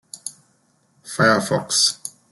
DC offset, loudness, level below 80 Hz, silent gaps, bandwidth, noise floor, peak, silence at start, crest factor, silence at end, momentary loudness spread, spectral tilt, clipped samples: under 0.1%; -18 LUFS; -64 dBFS; none; 12.5 kHz; -62 dBFS; -2 dBFS; 0.15 s; 20 dB; 0.2 s; 17 LU; -2.5 dB/octave; under 0.1%